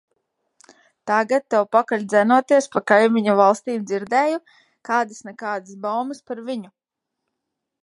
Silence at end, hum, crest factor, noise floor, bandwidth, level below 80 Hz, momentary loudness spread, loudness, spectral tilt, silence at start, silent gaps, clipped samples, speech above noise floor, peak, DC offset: 1.15 s; none; 20 dB; -81 dBFS; 11.5 kHz; -74 dBFS; 14 LU; -20 LUFS; -5 dB/octave; 1.05 s; none; under 0.1%; 61 dB; 0 dBFS; under 0.1%